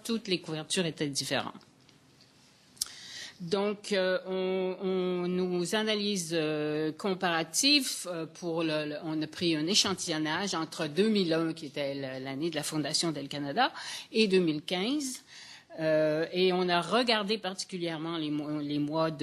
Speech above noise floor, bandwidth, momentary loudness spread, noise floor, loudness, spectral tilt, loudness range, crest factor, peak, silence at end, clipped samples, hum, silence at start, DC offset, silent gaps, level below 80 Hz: 30 dB; 13 kHz; 10 LU; -61 dBFS; -30 LUFS; -3.5 dB/octave; 6 LU; 26 dB; -6 dBFS; 0 s; under 0.1%; none; 0.05 s; under 0.1%; none; -76 dBFS